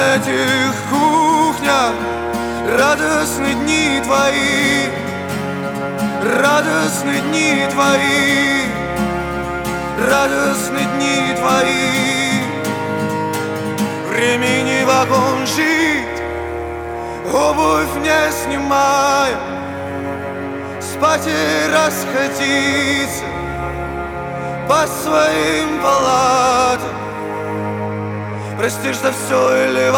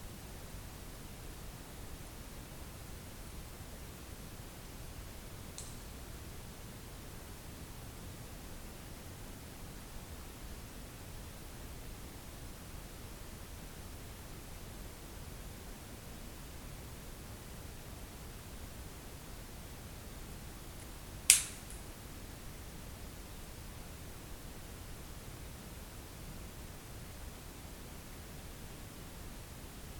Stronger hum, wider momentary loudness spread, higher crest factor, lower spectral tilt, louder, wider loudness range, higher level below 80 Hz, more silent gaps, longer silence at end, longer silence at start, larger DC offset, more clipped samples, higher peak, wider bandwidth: neither; first, 10 LU vs 1 LU; second, 16 dB vs 42 dB; first, -3.5 dB/octave vs -2 dB/octave; first, -16 LUFS vs -43 LUFS; second, 2 LU vs 15 LU; first, -40 dBFS vs -52 dBFS; neither; about the same, 0 s vs 0 s; about the same, 0 s vs 0 s; neither; neither; about the same, 0 dBFS vs -2 dBFS; about the same, over 20 kHz vs 19 kHz